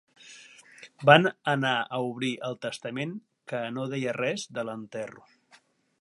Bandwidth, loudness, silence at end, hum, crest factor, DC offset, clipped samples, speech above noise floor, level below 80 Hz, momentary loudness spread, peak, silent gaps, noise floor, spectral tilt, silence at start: 11.5 kHz; -27 LUFS; 0.8 s; none; 26 dB; under 0.1%; under 0.1%; 34 dB; -76 dBFS; 22 LU; -2 dBFS; none; -62 dBFS; -5 dB/octave; 0.25 s